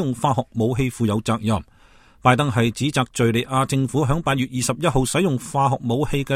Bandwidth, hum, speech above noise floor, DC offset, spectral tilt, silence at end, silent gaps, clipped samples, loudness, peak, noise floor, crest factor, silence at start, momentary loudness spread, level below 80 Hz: 15.5 kHz; none; 31 dB; under 0.1%; -5.5 dB/octave; 0 s; none; under 0.1%; -21 LUFS; -2 dBFS; -51 dBFS; 20 dB; 0 s; 4 LU; -40 dBFS